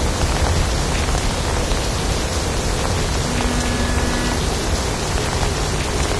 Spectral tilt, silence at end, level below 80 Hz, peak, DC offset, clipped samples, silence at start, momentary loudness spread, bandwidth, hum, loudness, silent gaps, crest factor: -4 dB/octave; 0 s; -24 dBFS; -2 dBFS; 0.3%; under 0.1%; 0 s; 2 LU; 11 kHz; none; -20 LUFS; none; 16 dB